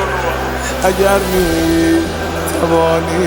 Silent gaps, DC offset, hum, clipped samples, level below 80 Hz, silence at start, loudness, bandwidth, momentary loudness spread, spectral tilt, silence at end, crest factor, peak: none; under 0.1%; none; under 0.1%; -28 dBFS; 0 s; -14 LUFS; 19.5 kHz; 6 LU; -5 dB/octave; 0 s; 14 dB; 0 dBFS